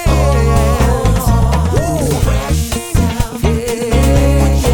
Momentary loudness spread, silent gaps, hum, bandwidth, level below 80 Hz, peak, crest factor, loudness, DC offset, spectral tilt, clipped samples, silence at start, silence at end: 5 LU; none; none; 19 kHz; -16 dBFS; -2 dBFS; 10 dB; -14 LUFS; under 0.1%; -6 dB/octave; under 0.1%; 0 s; 0 s